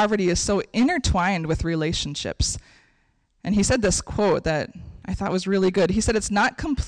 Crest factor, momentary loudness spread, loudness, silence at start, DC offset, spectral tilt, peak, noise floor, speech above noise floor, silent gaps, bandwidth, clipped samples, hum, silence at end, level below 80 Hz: 10 dB; 8 LU; -23 LUFS; 0 s; under 0.1%; -4.5 dB/octave; -12 dBFS; -65 dBFS; 43 dB; none; 10.5 kHz; under 0.1%; none; 0 s; -36 dBFS